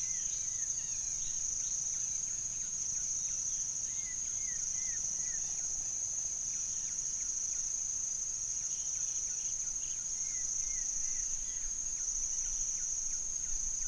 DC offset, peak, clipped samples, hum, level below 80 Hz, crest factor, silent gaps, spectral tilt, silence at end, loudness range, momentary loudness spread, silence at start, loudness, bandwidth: under 0.1%; -22 dBFS; under 0.1%; none; -54 dBFS; 14 dB; none; 1 dB/octave; 0 s; 0 LU; 2 LU; 0 s; -33 LUFS; 10.5 kHz